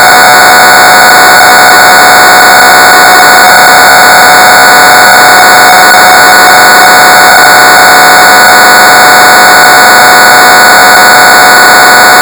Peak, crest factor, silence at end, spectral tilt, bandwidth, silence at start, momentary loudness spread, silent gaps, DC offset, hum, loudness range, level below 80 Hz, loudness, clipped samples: 0 dBFS; 0 dB; 0 s; -0.5 dB/octave; over 20 kHz; 0 s; 0 LU; none; 0.4%; none; 0 LU; -38 dBFS; 1 LUFS; 50%